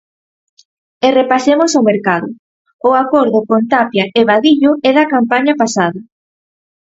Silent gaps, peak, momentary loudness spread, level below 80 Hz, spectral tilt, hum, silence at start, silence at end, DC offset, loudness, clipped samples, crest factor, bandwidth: 2.39-2.65 s, 2.73-2.79 s; 0 dBFS; 6 LU; -60 dBFS; -4.5 dB/octave; none; 1 s; 0.9 s; under 0.1%; -12 LUFS; under 0.1%; 14 dB; 8 kHz